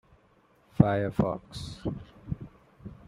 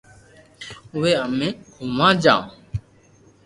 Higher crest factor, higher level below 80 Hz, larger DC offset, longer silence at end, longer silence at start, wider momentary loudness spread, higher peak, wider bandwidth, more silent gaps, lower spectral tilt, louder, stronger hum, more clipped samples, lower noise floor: first, 28 dB vs 22 dB; about the same, -50 dBFS vs -48 dBFS; neither; second, 0.15 s vs 0.65 s; first, 0.8 s vs 0.6 s; first, 23 LU vs 20 LU; second, -4 dBFS vs 0 dBFS; about the same, 12 kHz vs 11.5 kHz; neither; first, -8 dB/octave vs -5.5 dB/octave; second, -30 LUFS vs -20 LUFS; neither; neither; first, -63 dBFS vs -53 dBFS